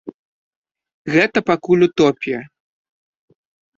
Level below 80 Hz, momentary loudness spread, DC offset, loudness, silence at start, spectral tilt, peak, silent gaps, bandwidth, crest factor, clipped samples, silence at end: -58 dBFS; 15 LU; under 0.1%; -17 LUFS; 0.05 s; -6 dB/octave; -2 dBFS; 0.14-0.64 s, 0.94-1.05 s; 7.6 kHz; 18 dB; under 0.1%; 1.3 s